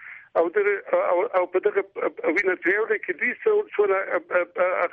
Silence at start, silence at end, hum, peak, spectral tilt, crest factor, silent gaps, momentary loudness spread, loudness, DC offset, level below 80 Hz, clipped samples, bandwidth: 0 s; 0.05 s; none; -8 dBFS; -6 dB/octave; 14 dB; none; 4 LU; -23 LUFS; under 0.1%; -74 dBFS; under 0.1%; 6.4 kHz